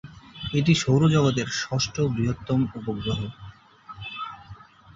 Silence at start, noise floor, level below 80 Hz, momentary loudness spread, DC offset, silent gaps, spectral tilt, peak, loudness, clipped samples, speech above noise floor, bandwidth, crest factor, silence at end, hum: 0.05 s; -47 dBFS; -48 dBFS; 19 LU; under 0.1%; none; -5.5 dB/octave; -8 dBFS; -24 LUFS; under 0.1%; 23 dB; 7.8 kHz; 18 dB; 0.4 s; none